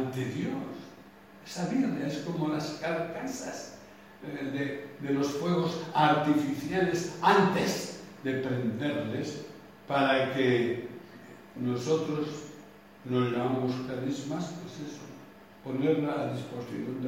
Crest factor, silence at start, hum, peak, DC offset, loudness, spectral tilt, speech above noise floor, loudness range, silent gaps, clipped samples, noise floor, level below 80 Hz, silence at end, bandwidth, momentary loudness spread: 22 dB; 0 s; none; -10 dBFS; under 0.1%; -30 LUFS; -5.5 dB/octave; 22 dB; 7 LU; none; under 0.1%; -52 dBFS; -68 dBFS; 0 s; 16.5 kHz; 19 LU